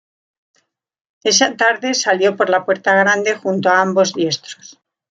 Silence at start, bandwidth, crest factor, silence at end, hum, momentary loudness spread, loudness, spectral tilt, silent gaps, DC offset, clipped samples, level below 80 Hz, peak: 1.25 s; 9 kHz; 16 dB; 0.6 s; none; 8 LU; -15 LUFS; -2.5 dB/octave; none; under 0.1%; under 0.1%; -68 dBFS; -2 dBFS